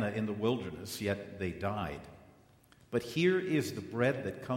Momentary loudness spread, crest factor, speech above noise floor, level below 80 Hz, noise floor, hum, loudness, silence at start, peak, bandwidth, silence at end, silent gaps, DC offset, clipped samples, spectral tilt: 10 LU; 18 dB; 29 dB; -62 dBFS; -63 dBFS; none; -34 LUFS; 0 s; -16 dBFS; 16 kHz; 0 s; none; under 0.1%; under 0.1%; -6 dB/octave